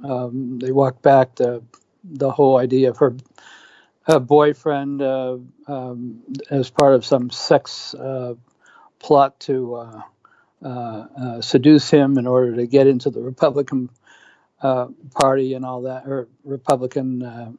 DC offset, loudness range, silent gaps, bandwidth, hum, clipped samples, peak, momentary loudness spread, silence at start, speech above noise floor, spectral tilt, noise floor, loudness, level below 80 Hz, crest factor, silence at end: under 0.1%; 6 LU; none; 11 kHz; none; under 0.1%; 0 dBFS; 17 LU; 0 s; 34 dB; -6.5 dB/octave; -52 dBFS; -18 LUFS; -64 dBFS; 18 dB; 0 s